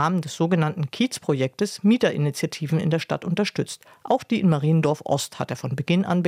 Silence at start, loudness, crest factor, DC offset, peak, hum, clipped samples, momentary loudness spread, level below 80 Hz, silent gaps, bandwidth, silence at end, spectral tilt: 0 s; -23 LUFS; 16 dB; under 0.1%; -6 dBFS; none; under 0.1%; 8 LU; -66 dBFS; none; 15.5 kHz; 0 s; -6 dB/octave